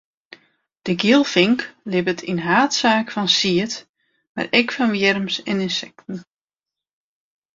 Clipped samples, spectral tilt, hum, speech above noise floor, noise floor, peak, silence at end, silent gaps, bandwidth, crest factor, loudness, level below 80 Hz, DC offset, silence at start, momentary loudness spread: under 0.1%; -4 dB/octave; none; 70 dB; -89 dBFS; -2 dBFS; 1.35 s; 3.89-3.94 s, 4.29-4.35 s; 7.8 kHz; 20 dB; -19 LUFS; -62 dBFS; under 0.1%; 0.85 s; 16 LU